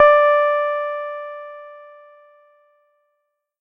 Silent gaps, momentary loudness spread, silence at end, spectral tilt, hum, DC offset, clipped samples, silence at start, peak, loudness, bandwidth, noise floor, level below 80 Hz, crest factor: none; 24 LU; 1.8 s; -1 dB/octave; none; under 0.1%; under 0.1%; 0 s; 0 dBFS; -18 LUFS; 5.6 kHz; -74 dBFS; -62 dBFS; 20 dB